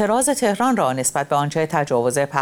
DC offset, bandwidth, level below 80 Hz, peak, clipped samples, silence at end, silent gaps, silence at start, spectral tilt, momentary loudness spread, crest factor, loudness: under 0.1%; 19.5 kHz; -56 dBFS; -4 dBFS; under 0.1%; 0 s; none; 0 s; -4.5 dB/octave; 3 LU; 16 dB; -19 LUFS